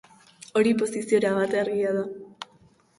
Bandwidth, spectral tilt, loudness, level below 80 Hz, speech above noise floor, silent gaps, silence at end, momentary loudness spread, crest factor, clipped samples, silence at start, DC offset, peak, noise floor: 11.5 kHz; -5.5 dB/octave; -25 LUFS; -68 dBFS; 35 dB; none; 0.55 s; 19 LU; 16 dB; under 0.1%; 0.55 s; under 0.1%; -10 dBFS; -59 dBFS